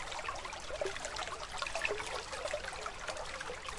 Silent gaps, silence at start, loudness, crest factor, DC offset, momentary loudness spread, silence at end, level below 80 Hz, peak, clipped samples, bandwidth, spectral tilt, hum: none; 0 s; -40 LUFS; 22 dB; under 0.1%; 6 LU; 0 s; -54 dBFS; -18 dBFS; under 0.1%; 11.5 kHz; -1.5 dB/octave; none